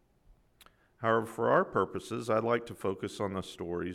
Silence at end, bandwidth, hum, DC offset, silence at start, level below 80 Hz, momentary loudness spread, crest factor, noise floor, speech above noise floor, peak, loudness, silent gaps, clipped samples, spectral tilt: 0 s; 15 kHz; none; under 0.1%; 1 s; -66 dBFS; 9 LU; 20 dB; -64 dBFS; 32 dB; -12 dBFS; -32 LUFS; none; under 0.1%; -6 dB/octave